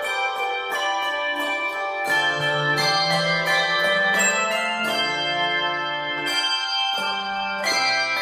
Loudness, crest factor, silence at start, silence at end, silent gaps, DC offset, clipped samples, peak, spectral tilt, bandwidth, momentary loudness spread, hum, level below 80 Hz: -21 LUFS; 16 dB; 0 s; 0 s; none; under 0.1%; under 0.1%; -8 dBFS; -2 dB/octave; 15.5 kHz; 6 LU; none; -64 dBFS